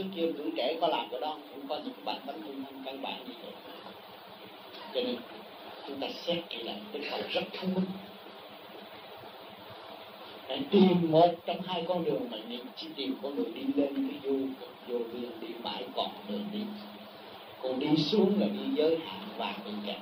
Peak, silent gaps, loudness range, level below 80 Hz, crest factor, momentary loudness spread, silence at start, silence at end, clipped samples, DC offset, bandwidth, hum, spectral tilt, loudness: -12 dBFS; none; 11 LU; -80 dBFS; 22 dB; 20 LU; 0 s; 0 s; under 0.1%; under 0.1%; 15.5 kHz; none; -7.5 dB/octave; -32 LUFS